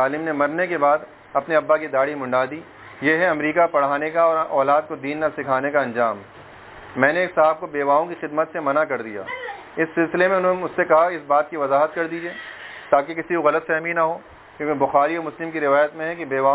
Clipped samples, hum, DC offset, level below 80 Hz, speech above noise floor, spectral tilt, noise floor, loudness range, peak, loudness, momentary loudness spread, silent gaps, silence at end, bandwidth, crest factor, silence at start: under 0.1%; none; under 0.1%; -62 dBFS; 21 dB; -9 dB/octave; -41 dBFS; 2 LU; 0 dBFS; -21 LUFS; 11 LU; none; 0 s; 4 kHz; 20 dB; 0 s